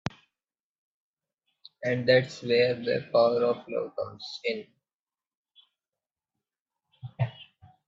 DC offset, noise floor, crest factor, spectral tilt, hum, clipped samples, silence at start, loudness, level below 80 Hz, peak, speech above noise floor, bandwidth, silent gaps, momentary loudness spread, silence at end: under 0.1%; under -90 dBFS; 22 dB; -6 dB/octave; none; under 0.1%; 1.8 s; -27 LUFS; -70 dBFS; -8 dBFS; over 64 dB; 7.6 kHz; 4.95-5.04 s, 5.27-5.31 s, 5.37-5.45 s, 6.60-6.66 s; 14 LU; 0.45 s